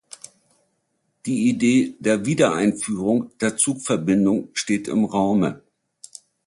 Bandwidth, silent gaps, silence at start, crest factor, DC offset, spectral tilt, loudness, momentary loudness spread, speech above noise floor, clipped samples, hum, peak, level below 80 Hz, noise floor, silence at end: 11.5 kHz; none; 1.25 s; 18 dB; under 0.1%; -5 dB/octave; -21 LUFS; 21 LU; 51 dB; under 0.1%; none; -4 dBFS; -58 dBFS; -71 dBFS; 0.9 s